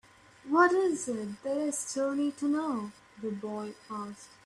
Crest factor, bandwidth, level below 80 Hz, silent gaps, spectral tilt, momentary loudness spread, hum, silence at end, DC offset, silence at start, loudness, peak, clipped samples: 20 dB; 13 kHz; -74 dBFS; none; -4 dB/octave; 16 LU; none; 0.2 s; under 0.1%; 0.45 s; -31 LUFS; -12 dBFS; under 0.1%